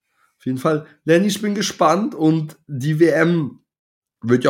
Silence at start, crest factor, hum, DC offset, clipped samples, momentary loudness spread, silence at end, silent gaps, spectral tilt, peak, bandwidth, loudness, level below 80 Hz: 0.45 s; 16 dB; none; under 0.1%; under 0.1%; 12 LU; 0 s; 3.79-4.02 s; -6 dB/octave; -2 dBFS; 16.5 kHz; -18 LUFS; -68 dBFS